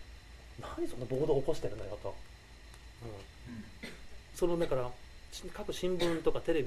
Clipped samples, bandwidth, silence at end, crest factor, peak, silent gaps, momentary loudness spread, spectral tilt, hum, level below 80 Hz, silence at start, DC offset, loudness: under 0.1%; 14 kHz; 0 s; 20 dB; -16 dBFS; none; 22 LU; -6 dB/octave; none; -48 dBFS; 0 s; under 0.1%; -36 LUFS